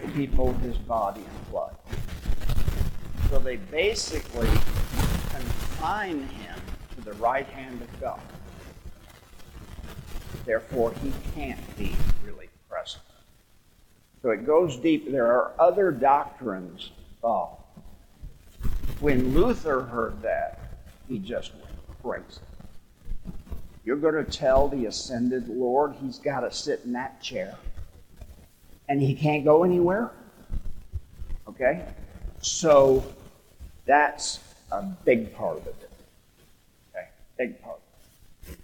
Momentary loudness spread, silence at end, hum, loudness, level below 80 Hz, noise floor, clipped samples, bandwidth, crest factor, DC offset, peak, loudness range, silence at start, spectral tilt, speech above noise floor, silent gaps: 21 LU; 0.1 s; none; -27 LUFS; -36 dBFS; -58 dBFS; under 0.1%; 17.5 kHz; 20 dB; under 0.1%; -6 dBFS; 10 LU; 0 s; -5.5 dB/octave; 34 dB; none